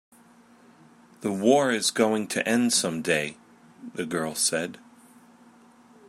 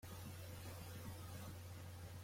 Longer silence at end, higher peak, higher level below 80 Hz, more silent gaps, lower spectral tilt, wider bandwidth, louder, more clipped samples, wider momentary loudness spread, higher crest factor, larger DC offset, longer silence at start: first, 1.3 s vs 0 s; first, -6 dBFS vs -40 dBFS; second, -74 dBFS vs -68 dBFS; neither; second, -3 dB/octave vs -5 dB/octave; about the same, 15.5 kHz vs 16.5 kHz; first, -25 LUFS vs -53 LUFS; neither; first, 14 LU vs 2 LU; first, 20 dB vs 12 dB; neither; first, 1.2 s vs 0 s